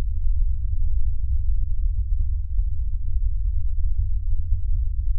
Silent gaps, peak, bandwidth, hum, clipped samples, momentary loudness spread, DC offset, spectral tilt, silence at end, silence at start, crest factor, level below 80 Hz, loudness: none; -8 dBFS; 0.2 kHz; none; under 0.1%; 1 LU; under 0.1%; -25.5 dB/octave; 0 s; 0 s; 10 dB; -22 dBFS; -28 LUFS